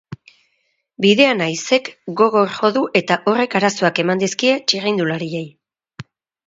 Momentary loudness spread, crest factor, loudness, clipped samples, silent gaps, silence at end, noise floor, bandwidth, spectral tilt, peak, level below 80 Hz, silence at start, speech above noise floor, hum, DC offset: 8 LU; 18 dB; -17 LUFS; under 0.1%; none; 0.45 s; -68 dBFS; 7.8 kHz; -4 dB/octave; 0 dBFS; -64 dBFS; 0.1 s; 51 dB; none; under 0.1%